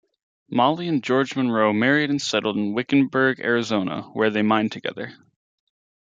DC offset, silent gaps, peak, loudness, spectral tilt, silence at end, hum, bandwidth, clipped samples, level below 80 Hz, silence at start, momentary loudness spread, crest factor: under 0.1%; none; -4 dBFS; -22 LUFS; -5.5 dB/octave; 0.9 s; none; 7.8 kHz; under 0.1%; -68 dBFS; 0.5 s; 8 LU; 18 dB